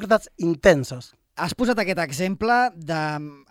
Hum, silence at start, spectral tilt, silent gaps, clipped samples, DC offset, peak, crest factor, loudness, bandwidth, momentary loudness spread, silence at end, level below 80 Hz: none; 0 s; -5 dB/octave; none; under 0.1%; under 0.1%; -2 dBFS; 20 dB; -22 LUFS; 16.5 kHz; 15 LU; 0.15 s; -48 dBFS